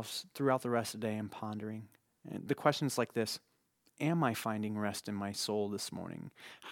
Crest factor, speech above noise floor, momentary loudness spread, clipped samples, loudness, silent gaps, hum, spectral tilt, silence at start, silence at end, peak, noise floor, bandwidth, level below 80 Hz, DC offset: 24 dB; 36 dB; 14 LU; under 0.1%; -36 LUFS; none; none; -5 dB/octave; 0 s; 0 s; -12 dBFS; -72 dBFS; 18 kHz; -80 dBFS; under 0.1%